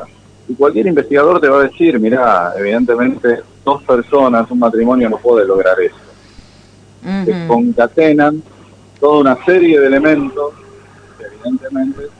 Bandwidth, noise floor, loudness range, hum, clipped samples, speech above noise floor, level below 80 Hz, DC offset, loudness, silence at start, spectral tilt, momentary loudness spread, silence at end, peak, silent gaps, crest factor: 9.4 kHz; -42 dBFS; 3 LU; none; under 0.1%; 31 dB; -48 dBFS; under 0.1%; -12 LUFS; 0 s; -7.5 dB/octave; 10 LU; 0.1 s; 0 dBFS; none; 12 dB